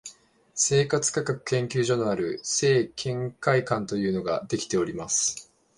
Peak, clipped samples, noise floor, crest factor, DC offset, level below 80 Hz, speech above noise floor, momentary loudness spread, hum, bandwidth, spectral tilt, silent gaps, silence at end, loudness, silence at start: -8 dBFS; under 0.1%; -52 dBFS; 18 dB; under 0.1%; -60 dBFS; 27 dB; 7 LU; none; 11.5 kHz; -4 dB/octave; none; 0.35 s; -25 LUFS; 0.05 s